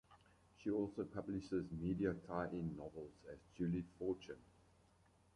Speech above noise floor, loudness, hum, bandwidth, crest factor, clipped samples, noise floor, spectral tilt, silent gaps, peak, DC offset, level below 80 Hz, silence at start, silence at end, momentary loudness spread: 29 dB; -45 LUFS; none; 10.5 kHz; 20 dB; under 0.1%; -73 dBFS; -8.5 dB/octave; none; -26 dBFS; under 0.1%; -66 dBFS; 0.1 s; 0.9 s; 14 LU